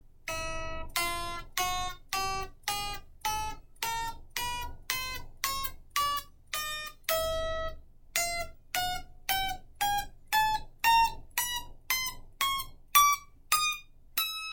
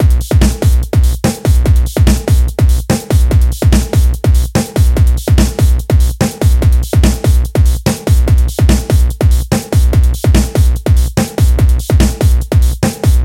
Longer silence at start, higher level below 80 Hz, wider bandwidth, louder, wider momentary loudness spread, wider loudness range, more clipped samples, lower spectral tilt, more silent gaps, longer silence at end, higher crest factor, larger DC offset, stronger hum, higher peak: about the same, 0.05 s vs 0 s; second, -46 dBFS vs -12 dBFS; about the same, 17 kHz vs 16.5 kHz; second, -31 LUFS vs -12 LUFS; first, 11 LU vs 3 LU; first, 7 LU vs 0 LU; neither; second, -0.5 dB/octave vs -6 dB/octave; neither; about the same, 0 s vs 0 s; first, 28 dB vs 10 dB; neither; neither; second, -6 dBFS vs 0 dBFS